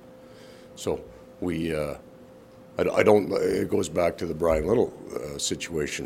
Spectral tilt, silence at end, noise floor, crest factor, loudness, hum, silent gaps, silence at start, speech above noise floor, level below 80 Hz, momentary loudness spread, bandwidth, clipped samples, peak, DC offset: -5 dB/octave; 0 s; -49 dBFS; 22 dB; -26 LUFS; none; none; 0.05 s; 24 dB; -48 dBFS; 14 LU; 16 kHz; under 0.1%; -4 dBFS; under 0.1%